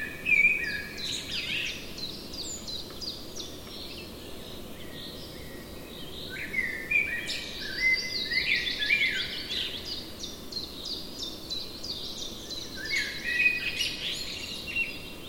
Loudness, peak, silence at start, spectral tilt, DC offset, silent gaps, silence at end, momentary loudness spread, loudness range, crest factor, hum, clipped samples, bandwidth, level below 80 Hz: -29 LUFS; -12 dBFS; 0 s; -1.5 dB/octave; under 0.1%; none; 0 s; 16 LU; 11 LU; 20 dB; none; under 0.1%; 17 kHz; -52 dBFS